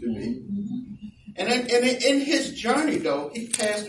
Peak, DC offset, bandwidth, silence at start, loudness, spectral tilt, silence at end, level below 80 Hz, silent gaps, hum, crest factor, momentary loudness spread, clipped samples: -6 dBFS; under 0.1%; 11.5 kHz; 0 s; -24 LUFS; -3 dB/octave; 0 s; -58 dBFS; none; none; 18 dB; 14 LU; under 0.1%